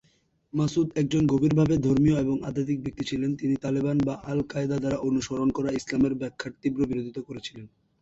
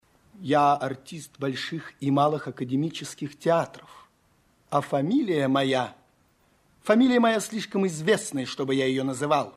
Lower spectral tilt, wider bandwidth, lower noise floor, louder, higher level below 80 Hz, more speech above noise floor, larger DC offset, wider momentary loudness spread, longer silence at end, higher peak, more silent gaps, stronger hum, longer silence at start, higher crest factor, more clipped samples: first, -7 dB/octave vs -5.5 dB/octave; second, 8 kHz vs 14 kHz; about the same, -67 dBFS vs -65 dBFS; about the same, -26 LUFS vs -25 LUFS; first, -52 dBFS vs -68 dBFS; about the same, 41 dB vs 40 dB; neither; second, 10 LU vs 13 LU; first, 0.35 s vs 0.05 s; second, -12 dBFS vs -6 dBFS; neither; neither; first, 0.55 s vs 0.4 s; second, 14 dB vs 20 dB; neither